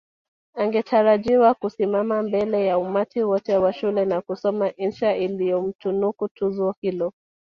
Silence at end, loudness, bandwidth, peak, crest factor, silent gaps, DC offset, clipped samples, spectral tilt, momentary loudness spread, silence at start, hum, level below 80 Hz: 0.45 s; -22 LUFS; 6.8 kHz; -6 dBFS; 16 dB; 5.75-5.79 s, 6.31-6.35 s, 6.77-6.82 s; under 0.1%; under 0.1%; -8 dB/octave; 8 LU; 0.55 s; none; -62 dBFS